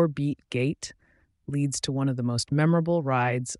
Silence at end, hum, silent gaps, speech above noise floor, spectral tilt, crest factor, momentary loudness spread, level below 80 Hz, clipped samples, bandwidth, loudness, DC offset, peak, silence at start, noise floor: 0.05 s; none; none; 19 dB; -5.5 dB/octave; 16 dB; 11 LU; -60 dBFS; under 0.1%; 11.5 kHz; -26 LUFS; under 0.1%; -12 dBFS; 0 s; -45 dBFS